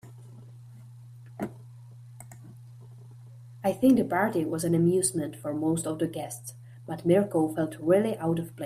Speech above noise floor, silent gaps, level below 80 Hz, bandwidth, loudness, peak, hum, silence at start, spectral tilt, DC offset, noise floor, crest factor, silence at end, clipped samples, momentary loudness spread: 21 dB; none; -64 dBFS; 15.5 kHz; -27 LUFS; -10 dBFS; none; 0.05 s; -6 dB/octave; under 0.1%; -47 dBFS; 18 dB; 0 s; under 0.1%; 25 LU